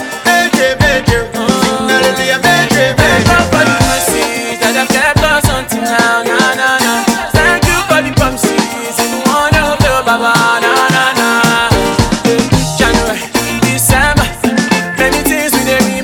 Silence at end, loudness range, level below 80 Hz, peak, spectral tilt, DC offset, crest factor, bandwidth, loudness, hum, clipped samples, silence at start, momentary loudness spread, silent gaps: 0 s; 1 LU; -26 dBFS; 0 dBFS; -4 dB/octave; under 0.1%; 10 dB; 20 kHz; -10 LUFS; none; 0.2%; 0 s; 4 LU; none